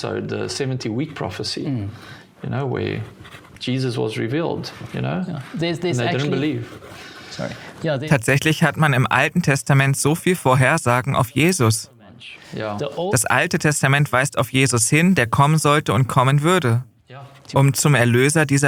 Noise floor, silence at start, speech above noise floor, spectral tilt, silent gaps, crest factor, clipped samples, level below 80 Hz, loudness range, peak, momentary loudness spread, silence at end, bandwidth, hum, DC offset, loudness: -41 dBFS; 0 s; 22 dB; -5 dB/octave; none; 18 dB; under 0.1%; -52 dBFS; 9 LU; -2 dBFS; 14 LU; 0 s; 17 kHz; none; under 0.1%; -19 LUFS